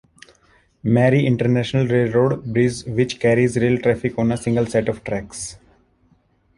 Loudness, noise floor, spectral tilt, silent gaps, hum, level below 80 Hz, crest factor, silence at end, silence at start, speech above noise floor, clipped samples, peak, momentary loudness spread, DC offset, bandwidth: -19 LUFS; -60 dBFS; -6.5 dB/octave; none; none; -48 dBFS; 16 dB; 1 s; 0.85 s; 41 dB; under 0.1%; -2 dBFS; 10 LU; under 0.1%; 11.5 kHz